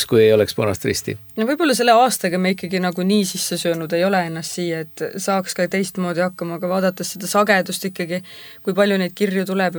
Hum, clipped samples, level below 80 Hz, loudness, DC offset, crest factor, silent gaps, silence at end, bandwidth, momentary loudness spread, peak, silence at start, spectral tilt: none; under 0.1%; -58 dBFS; -19 LUFS; under 0.1%; 18 dB; none; 0 s; over 20 kHz; 11 LU; -2 dBFS; 0 s; -4.5 dB/octave